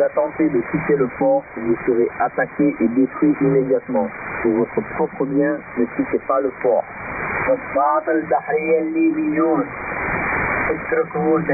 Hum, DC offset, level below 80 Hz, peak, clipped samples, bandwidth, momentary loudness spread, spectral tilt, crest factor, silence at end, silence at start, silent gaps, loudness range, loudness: none; under 0.1%; -48 dBFS; -6 dBFS; under 0.1%; 2.6 kHz; 5 LU; -12.5 dB/octave; 14 dB; 0 s; 0 s; none; 2 LU; -20 LUFS